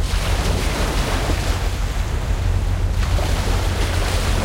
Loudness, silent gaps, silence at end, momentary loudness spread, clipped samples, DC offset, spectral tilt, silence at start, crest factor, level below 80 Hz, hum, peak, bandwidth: -21 LUFS; none; 0 s; 3 LU; under 0.1%; under 0.1%; -4.5 dB/octave; 0 s; 12 dB; -22 dBFS; none; -8 dBFS; 16 kHz